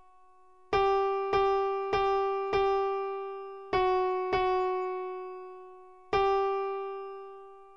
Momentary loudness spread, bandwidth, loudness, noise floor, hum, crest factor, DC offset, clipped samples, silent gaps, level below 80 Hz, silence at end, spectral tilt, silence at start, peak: 16 LU; 6.6 kHz; -29 LUFS; -60 dBFS; none; 16 dB; 0.1%; under 0.1%; none; -54 dBFS; 0.05 s; -5.5 dB/octave; 0.7 s; -14 dBFS